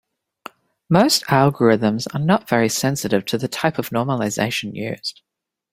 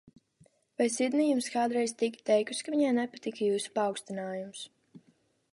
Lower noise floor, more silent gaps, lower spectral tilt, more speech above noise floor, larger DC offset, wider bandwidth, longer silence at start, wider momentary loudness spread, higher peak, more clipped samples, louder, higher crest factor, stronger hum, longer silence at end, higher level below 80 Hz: second, -42 dBFS vs -69 dBFS; neither; about the same, -5 dB/octave vs -4 dB/octave; second, 23 dB vs 39 dB; neither; first, 16.5 kHz vs 11.5 kHz; about the same, 0.9 s vs 0.8 s; about the same, 10 LU vs 11 LU; first, 0 dBFS vs -14 dBFS; neither; first, -19 LUFS vs -30 LUFS; about the same, 20 dB vs 18 dB; neither; about the same, 0.6 s vs 0.55 s; first, -58 dBFS vs -82 dBFS